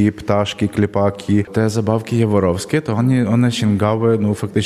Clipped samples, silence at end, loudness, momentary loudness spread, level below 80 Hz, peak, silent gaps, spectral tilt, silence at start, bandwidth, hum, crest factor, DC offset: under 0.1%; 0 s; -17 LUFS; 4 LU; -48 dBFS; -2 dBFS; none; -7 dB/octave; 0 s; 14 kHz; none; 14 dB; under 0.1%